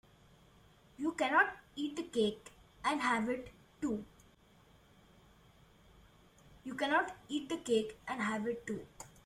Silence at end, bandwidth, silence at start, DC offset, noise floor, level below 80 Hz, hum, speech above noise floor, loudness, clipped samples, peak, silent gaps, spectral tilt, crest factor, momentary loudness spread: 0.2 s; 15 kHz; 1 s; under 0.1%; -65 dBFS; -68 dBFS; none; 29 dB; -36 LUFS; under 0.1%; -16 dBFS; none; -4 dB/octave; 22 dB; 16 LU